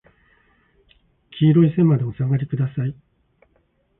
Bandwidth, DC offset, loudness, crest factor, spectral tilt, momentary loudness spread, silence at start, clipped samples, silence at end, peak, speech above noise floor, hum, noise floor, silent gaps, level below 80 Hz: 3.8 kHz; under 0.1%; -19 LUFS; 16 dB; -13.5 dB/octave; 12 LU; 1.35 s; under 0.1%; 1.05 s; -6 dBFS; 46 dB; none; -64 dBFS; none; -54 dBFS